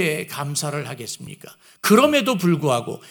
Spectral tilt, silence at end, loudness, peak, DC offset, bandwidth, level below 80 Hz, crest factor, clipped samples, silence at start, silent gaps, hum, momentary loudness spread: -4.5 dB/octave; 0 s; -20 LUFS; -2 dBFS; under 0.1%; 18 kHz; -68 dBFS; 20 dB; under 0.1%; 0 s; none; none; 18 LU